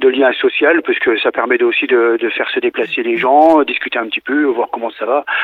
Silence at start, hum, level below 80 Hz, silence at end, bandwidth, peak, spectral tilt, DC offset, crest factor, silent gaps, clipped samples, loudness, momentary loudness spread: 0 s; none; -60 dBFS; 0 s; 4.6 kHz; 0 dBFS; -5.5 dB/octave; under 0.1%; 14 dB; none; under 0.1%; -14 LUFS; 7 LU